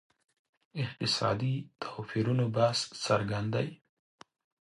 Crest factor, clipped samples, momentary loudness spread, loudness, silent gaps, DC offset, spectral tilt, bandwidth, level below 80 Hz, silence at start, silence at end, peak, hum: 20 dB; under 0.1%; 10 LU; -31 LUFS; none; under 0.1%; -5.5 dB/octave; 11.5 kHz; -64 dBFS; 0.75 s; 0.95 s; -12 dBFS; none